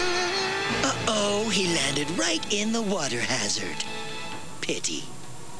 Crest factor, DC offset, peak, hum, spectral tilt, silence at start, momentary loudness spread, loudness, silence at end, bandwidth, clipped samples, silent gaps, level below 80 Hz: 18 dB; 2%; -10 dBFS; none; -2.5 dB/octave; 0 s; 11 LU; -26 LUFS; 0 s; 11 kHz; under 0.1%; none; -54 dBFS